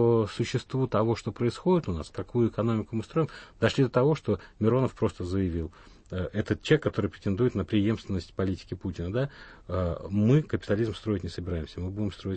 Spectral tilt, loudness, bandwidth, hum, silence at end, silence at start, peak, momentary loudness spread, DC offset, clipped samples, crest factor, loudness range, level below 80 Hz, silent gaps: -7.5 dB/octave; -29 LUFS; 8.8 kHz; none; 0 s; 0 s; -10 dBFS; 10 LU; under 0.1%; under 0.1%; 18 dB; 2 LU; -50 dBFS; none